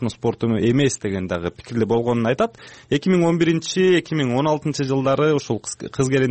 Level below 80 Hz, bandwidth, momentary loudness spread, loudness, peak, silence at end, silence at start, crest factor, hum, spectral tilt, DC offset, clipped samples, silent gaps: -52 dBFS; 8.8 kHz; 8 LU; -20 LUFS; -6 dBFS; 0 s; 0 s; 12 dB; none; -6 dB/octave; under 0.1%; under 0.1%; none